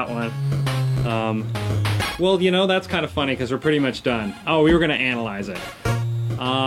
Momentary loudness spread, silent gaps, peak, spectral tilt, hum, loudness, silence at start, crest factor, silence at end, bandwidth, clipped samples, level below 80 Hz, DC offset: 8 LU; none; -6 dBFS; -6 dB/octave; none; -21 LUFS; 0 s; 14 dB; 0 s; 16 kHz; under 0.1%; -42 dBFS; under 0.1%